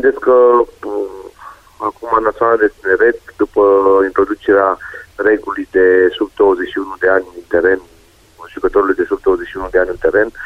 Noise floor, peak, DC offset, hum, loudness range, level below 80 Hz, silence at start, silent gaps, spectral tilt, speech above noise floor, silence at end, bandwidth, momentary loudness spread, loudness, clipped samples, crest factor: -41 dBFS; 0 dBFS; under 0.1%; none; 3 LU; -42 dBFS; 0 s; none; -6.5 dB/octave; 28 dB; 0 s; 7.4 kHz; 12 LU; -14 LUFS; under 0.1%; 14 dB